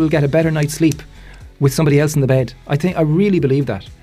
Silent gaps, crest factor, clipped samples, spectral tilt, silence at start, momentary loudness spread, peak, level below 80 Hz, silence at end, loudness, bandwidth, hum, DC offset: none; 12 dB; under 0.1%; -7 dB/octave; 0 s; 5 LU; -4 dBFS; -40 dBFS; 0.1 s; -16 LUFS; 15.5 kHz; none; under 0.1%